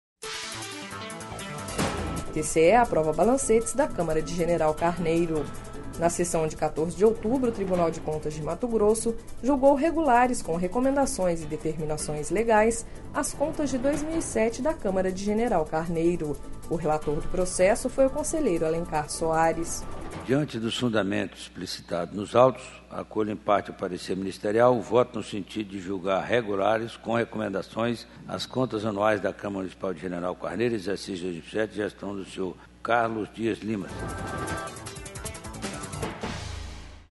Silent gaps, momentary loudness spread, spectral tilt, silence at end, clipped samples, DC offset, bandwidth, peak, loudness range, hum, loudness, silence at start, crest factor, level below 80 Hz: none; 13 LU; -5 dB/octave; 0.05 s; under 0.1%; under 0.1%; 11.5 kHz; -6 dBFS; 6 LU; none; -27 LUFS; 0.2 s; 22 dB; -42 dBFS